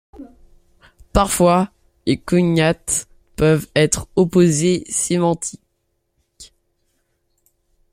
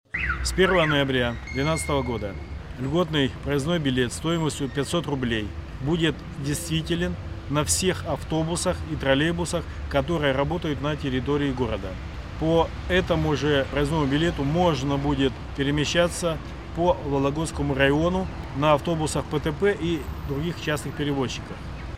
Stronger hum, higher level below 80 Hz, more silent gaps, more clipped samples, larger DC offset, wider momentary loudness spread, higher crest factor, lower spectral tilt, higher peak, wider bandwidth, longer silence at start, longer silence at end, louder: neither; about the same, -38 dBFS vs -38 dBFS; neither; neither; second, under 0.1% vs 0.2%; about the same, 9 LU vs 8 LU; about the same, 18 dB vs 18 dB; about the same, -5 dB/octave vs -5 dB/octave; first, -2 dBFS vs -6 dBFS; about the same, 16 kHz vs 16 kHz; about the same, 0.2 s vs 0.15 s; first, 1.5 s vs 0 s; first, -18 LUFS vs -25 LUFS